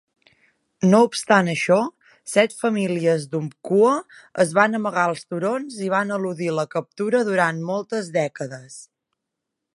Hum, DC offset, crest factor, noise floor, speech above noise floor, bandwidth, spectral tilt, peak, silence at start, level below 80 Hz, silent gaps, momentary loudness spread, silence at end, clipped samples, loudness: none; under 0.1%; 20 dB; -82 dBFS; 61 dB; 11.5 kHz; -5.5 dB/octave; -2 dBFS; 0.8 s; -72 dBFS; none; 11 LU; 0.9 s; under 0.1%; -21 LUFS